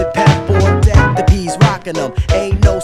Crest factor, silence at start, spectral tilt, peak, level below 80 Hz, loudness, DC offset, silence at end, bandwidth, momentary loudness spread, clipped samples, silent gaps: 12 dB; 0 s; -6.5 dB/octave; 0 dBFS; -18 dBFS; -13 LUFS; under 0.1%; 0 s; 12 kHz; 7 LU; 0.6%; none